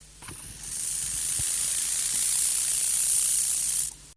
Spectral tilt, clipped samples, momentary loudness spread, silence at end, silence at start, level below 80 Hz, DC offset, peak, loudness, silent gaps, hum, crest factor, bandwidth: 1.5 dB/octave; under 0.1%; 14 LU; 0.05 s; 0 s; -54 dBFS; under 0.1%; -10 dBFS; -23 LUFS; none; none; 18 dB; 11 kHz